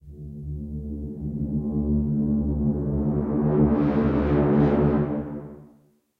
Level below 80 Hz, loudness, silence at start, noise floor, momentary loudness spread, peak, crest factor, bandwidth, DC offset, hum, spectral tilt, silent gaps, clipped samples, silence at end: -34 dBFS; -24 LUFS; 0.05 s; -58 dBFS; 15 LU; -8 dBFS; 16 dB; 4.4 kHz; under 0.1%; none; -11.5 dB/octave; none; under 0.1%; 0.55 s